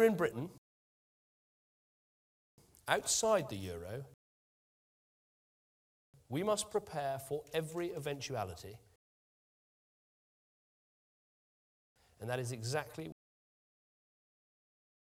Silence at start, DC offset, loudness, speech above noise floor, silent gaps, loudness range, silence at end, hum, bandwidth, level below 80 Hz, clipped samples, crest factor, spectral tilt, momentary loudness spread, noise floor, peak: 0 s; under 0.1%; -37 LUFS; over 53 dB; 0.58-2.58 s, 4.14-6.13 s, 8.96-11.96 s; 9 LU; 2 s; none; 16.5 kHz; -72 dBFS; under 0.1%; 28 dB; -4 dB/octave; 17 LU; under -90 dBFS; -14 dBFS